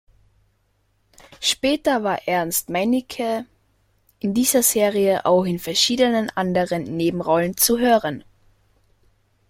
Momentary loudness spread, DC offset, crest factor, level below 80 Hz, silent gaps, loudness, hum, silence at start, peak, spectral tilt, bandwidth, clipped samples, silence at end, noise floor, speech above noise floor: 8 LU; under 0.1%; 18 dB; -54 dBFS; none; -20 LUFS; none; 1.4 s; -2 dBFS; -3.5 dB/octave; 16.5 kHz; under 0.1%; 1.3 s; -65 dBFS; 46 dB